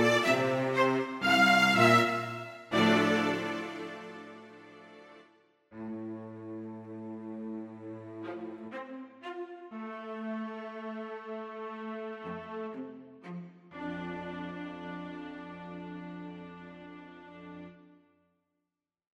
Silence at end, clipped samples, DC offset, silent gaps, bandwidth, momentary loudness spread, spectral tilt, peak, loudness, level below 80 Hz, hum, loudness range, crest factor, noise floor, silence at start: 1.35 s; under 0.1%; under 0.1%; none; 16 kHz; 23 LU; -5 dB/octave; -10 dBFS; -31 LUFS; -74 dBFS; none; 19 LU; 24 dB; -87 dBFS; 0 s